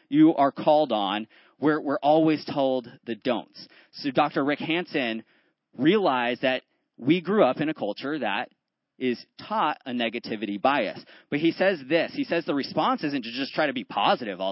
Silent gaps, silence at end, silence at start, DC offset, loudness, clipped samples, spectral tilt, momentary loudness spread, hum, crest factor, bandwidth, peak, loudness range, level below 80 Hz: none; 0 s; 0.1 s; under 0.1%; -25 LUFS; under 0.1%; -9.5 dB/octave; 10 LU; none; 18 dB; 5.8 kHz; -6 dBFS; 3 LU; -76 dBFS